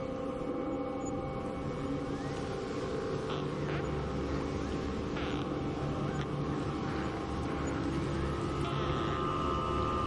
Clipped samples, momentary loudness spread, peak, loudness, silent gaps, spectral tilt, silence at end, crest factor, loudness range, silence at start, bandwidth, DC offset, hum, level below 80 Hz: under 0.1%; 4 LU; -18 dBFS; -35 LUFS; none; -6.5 dB/octave; 0 s; 16 dB; 2 LU; 0 s; 11 kHz; under 0.1%; none; -46 dBFS